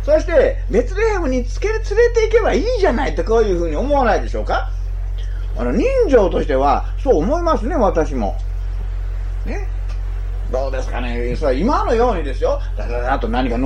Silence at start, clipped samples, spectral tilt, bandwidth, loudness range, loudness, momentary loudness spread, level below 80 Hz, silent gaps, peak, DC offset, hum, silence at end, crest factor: 0 s; under 0.1%; -6.5 dB/octave; 7.8 kHz; 5 LU; -18 LUFS; 12 LU; -22 dBFS; none; 0 dBFS; under 0.1%; none; 0 s; 16 dB